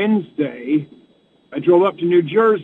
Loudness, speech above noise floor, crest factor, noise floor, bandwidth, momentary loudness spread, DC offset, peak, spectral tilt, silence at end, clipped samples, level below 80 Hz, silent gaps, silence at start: -17 LUFS; 39 dB; 14 dB; -55 dBFS; 4.1 kHz; 10 LU; under 0.1%; -4 dBFS; -9.5 dB/octave; 0 s; under 0.1%; -68 dBFS; none; 0 s